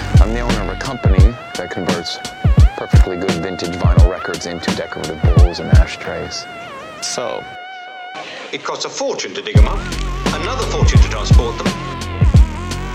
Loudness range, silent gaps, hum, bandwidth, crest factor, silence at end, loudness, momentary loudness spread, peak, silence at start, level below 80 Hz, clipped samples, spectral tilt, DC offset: 5 LU; none; none; 12 kHz; 14 dB; 0 s; -17 LUFS; 13 LU; 0 dBFS; 0 s; -18 dBFS; under 0.1%; -5.5 dB/octave; under 0.1%